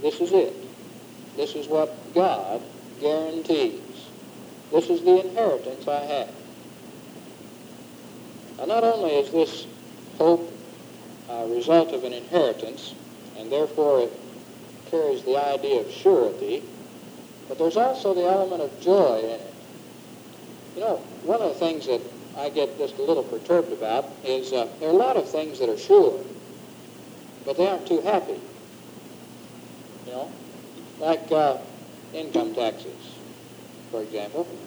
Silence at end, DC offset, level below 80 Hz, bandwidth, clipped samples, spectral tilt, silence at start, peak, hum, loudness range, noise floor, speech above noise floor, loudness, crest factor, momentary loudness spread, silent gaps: 0 s; under 0.1%; -76 dBFS; over 20 kHz; under 0.1%; -5.5 dB/octave; 0 s; -4 dBFS; none; 6 LU; -44 dBFS; 21 dB; -24 LUFS; 20 dB; 23 LU; none